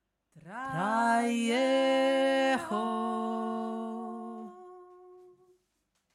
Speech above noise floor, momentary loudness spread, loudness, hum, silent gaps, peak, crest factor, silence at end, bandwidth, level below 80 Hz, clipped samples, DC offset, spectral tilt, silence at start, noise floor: 48 dB; 17 LU; -29 LUFS; none; none; -16 dBFS; 16 dB; 0.9 s; 14.5 kHz; -78 dBFS; under 0.1%; under 0.1%; -4.5 dB/octave; 0.35 s; -78 dBFS